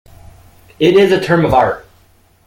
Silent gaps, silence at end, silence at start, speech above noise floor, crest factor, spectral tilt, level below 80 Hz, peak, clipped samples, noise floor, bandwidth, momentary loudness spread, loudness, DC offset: none; 0.65 s; 0.8 s; 39 dB; 14 dB; -6.5 dB/octave; -40 dBFS; 0 dBFS; under 0.1%; -50 dBFS; 16 kHz; 7 LU; -12 LUFS; under 0.1%